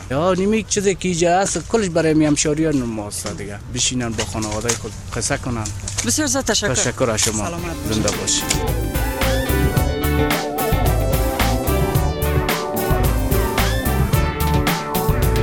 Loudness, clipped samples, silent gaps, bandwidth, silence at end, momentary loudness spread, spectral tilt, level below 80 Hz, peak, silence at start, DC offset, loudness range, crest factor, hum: -19 LUFS; under 0.1%; none; 19.5 kHz; 0 s; 6 LU; -4 dB/octave; -26 dBFS; -2 dBFS; 0 s; under 0.1%; 2 LU; 18 dB; none